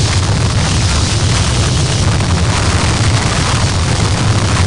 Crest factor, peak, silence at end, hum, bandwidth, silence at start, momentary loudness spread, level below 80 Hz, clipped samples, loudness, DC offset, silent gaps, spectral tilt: 10 dB; -2 dBFS; 0 s; none; 10.5 kHz; 0 s; 1 LU; -22 dBFS; under 0.1%; -13 LUFS; 2%; none; -4 dB/octave